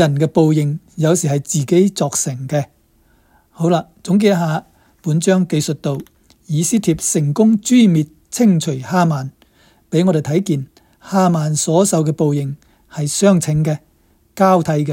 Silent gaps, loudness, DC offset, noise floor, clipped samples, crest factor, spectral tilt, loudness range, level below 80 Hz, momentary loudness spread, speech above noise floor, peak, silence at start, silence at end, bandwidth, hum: none; -16 LUFS; under 0.1%; -55 dBFS; under 0.1%; 16 dB; -6 dB/octave; 3 LU; -52 dBFS; 10 LU; 40 dB; 0 dBFS; 0 s; 0 s; 16.5 kHz; none